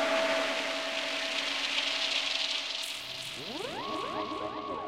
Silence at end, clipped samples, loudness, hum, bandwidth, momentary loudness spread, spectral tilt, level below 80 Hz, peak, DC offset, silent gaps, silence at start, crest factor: 0 s; under 0.1%; -31 LUFS; none; 16 kHz; 8 LU; -1 dB/octave; -68 dBFS; -14 dBFS; under 0.1%; none; 0 s; 18 dB